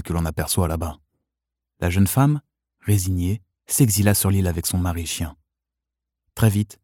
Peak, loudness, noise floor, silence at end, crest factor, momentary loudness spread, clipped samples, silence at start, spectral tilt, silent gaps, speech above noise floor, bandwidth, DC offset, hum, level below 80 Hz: -4 dBFS; -21 LUFS; -85 dBFS; 0.1 s; 18 dB; 11 LU; under 0.1%; 0 s; -5 dB/octave; none; 64 dB; 18 kHz; under 0.1%; none; -38 dBFS